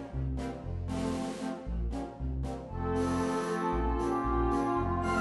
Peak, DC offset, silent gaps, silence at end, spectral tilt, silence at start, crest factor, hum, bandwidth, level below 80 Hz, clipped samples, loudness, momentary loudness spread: -18 dBFS; under 0.1%; none; 0 s; -7 dB/octave; 0 s; 14 dB; none; 11.5 kHz; -38 dBFS; under 0.1%; -33 LUFS; 8 LU